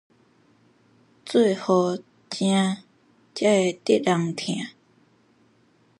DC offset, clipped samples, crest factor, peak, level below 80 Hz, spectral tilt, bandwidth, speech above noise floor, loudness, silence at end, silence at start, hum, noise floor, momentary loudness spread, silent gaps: under 0.1%; under 0.1%; 18 dB; -6 dBFS; -74 dBFS; -5.5 dB/octave; 11.5 kHz; 39 dB; -23 LUFS; 1.3 s; 1.25 s; none; -61 dBFS; 15 LU; none